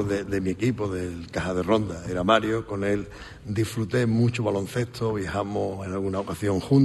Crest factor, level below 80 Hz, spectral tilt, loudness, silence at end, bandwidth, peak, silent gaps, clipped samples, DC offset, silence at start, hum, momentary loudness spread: 20 dB; -50 dBFS; -6.5 dB/octave; -26 LUFS; 0 s; 12.5 kHz; -4 dBFS; none; under 0.1%; under 0.1%; 0 s; none; 8 LU